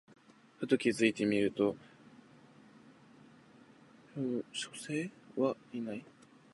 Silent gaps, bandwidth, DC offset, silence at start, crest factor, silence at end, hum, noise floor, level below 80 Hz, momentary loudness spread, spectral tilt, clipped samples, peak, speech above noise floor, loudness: none; 11.5 kHz; under 0.1%; 0.6 s; 24 dB; 0.5 s; none; -60 dBFS; -76 dBFS; 13 LU; -5 dB/octave; under 0.1%; -14 dBFS; 27 dB; -35 LUFS